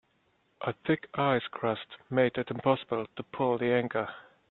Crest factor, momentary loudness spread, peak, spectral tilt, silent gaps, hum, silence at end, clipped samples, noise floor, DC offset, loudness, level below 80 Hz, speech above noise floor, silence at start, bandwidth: 22 dB; 10 LU; -10 dBFS; -9.5 dB/octave; none; none; 0.3 s; under 0.1%; -71 dBFS; under 0.1%; -31 LUFS; -68 dBFS; 41 dB; 0.6 s; 4.2 kHz